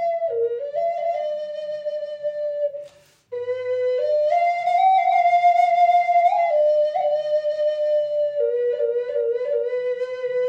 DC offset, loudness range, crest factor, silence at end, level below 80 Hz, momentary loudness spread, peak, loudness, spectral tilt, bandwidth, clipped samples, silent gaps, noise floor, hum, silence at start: under 0.1%; 9 LU; 12 dB; 0 s; -76 dBFS; 11 LU; -8 dBFS; -21 LUFS; -2.5 dB/octave; 7.8 kHz; under 0.1%; none; -46 dBFS; none; 0 s